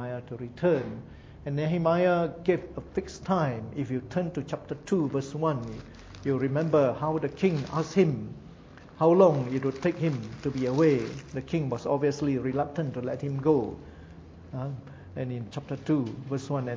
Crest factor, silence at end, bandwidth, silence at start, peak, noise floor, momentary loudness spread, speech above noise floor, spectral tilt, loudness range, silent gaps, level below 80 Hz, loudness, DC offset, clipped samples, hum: 20 dB; 0 s; 7.8 kHz; 0 s; -8 dBFS; -49 dBFS; 16 LU; 21 dB; -8 dB/octave; 6 LU; none; -54 dBFS; -28 LUFS; under 0.1%; under 0.1%; none